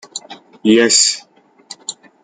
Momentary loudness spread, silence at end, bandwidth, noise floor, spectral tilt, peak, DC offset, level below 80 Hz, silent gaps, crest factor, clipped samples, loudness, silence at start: 20 LU; 0.3 s; 9.6 kHz; -40 dBFS; -1.5 dB/octave; 0 dBFS; under 0.1%; -62 dBFS; none; 18 dB; under 0.1%; -12 LUFS; 0.15 s